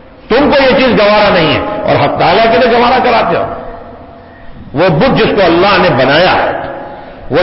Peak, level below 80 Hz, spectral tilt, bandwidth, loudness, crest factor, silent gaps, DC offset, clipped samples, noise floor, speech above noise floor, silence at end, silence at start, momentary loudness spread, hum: 0 dBFS; -32 dBFS; -9 dB/octave; 5.8 kHz; -8 LUFS; 10 dB; none; under 0.1%; under 0.1%; -32 dBFS; 24 dB; 0 s; 0.25 s; 15 LU; none